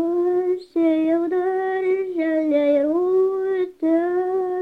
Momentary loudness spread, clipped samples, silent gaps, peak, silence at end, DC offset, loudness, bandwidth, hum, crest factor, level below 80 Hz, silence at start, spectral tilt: 4 LU; under 0.1%; none; -8 dBFS; 0 s; under 0.1%; -21 LUFS; 4.7 kHz; none; 12 dB; -66 dBFS; 0 s; -7 dB/octave